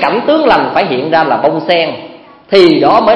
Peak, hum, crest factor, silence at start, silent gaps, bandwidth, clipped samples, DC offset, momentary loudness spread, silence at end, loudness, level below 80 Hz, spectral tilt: 0 dBFS; none; 10 dB; 0 s; none; 10.5 kHz; 0.6%; under 0.1%; 6 LU; 0 s; -10 LUFS; -48 dBFS; -6.5 dB/octave